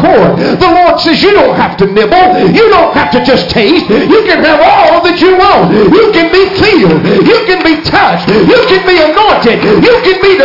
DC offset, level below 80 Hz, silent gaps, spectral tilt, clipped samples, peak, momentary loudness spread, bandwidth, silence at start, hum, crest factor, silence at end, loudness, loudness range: under 0.1%; -32 dBFS; none; -6.5 dB/octave; 0.3%; 0 dBFS; 3 LU; 5.8 kHz; 0 s; none; 6 dB; 0 s; -5 LUFS; 1 LU